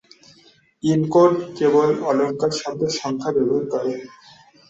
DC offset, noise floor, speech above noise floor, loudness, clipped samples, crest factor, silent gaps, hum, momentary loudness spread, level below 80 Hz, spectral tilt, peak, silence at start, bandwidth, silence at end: under 0.1%; -54 dBFS; 35 dB; -20 LUFS; under 0.1%; 18 dB; none; none; 9 LU; -62 dBFS; -6 dB/octave; -2 dBFS; 0.85 s; 8.2 kHz; 0.6 s